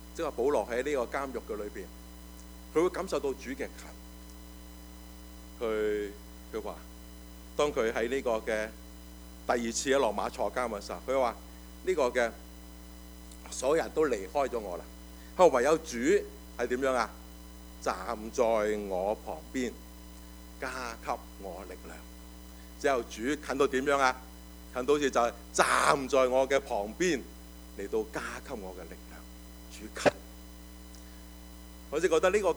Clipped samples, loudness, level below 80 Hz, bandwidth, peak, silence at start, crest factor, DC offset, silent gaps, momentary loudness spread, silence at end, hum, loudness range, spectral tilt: under 0.1%; -31 LUFS; -50 dBFS; over 20 kHz; -8 dBFS; 0 s; 24 dB; under 0.1%; none; 22 LU; 0 s; none; 9 LU; -4 dB/octave